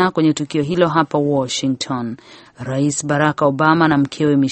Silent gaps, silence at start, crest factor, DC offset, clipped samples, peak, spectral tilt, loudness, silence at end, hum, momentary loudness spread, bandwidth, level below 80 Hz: none; 0 s; 16 dB; under 0.1%; under 0.1%; 0 dBFS; -5.5 dB/octave; -17 LUFS; 0 s; none; 10 LU; 8.8 kHz; -54 dBFS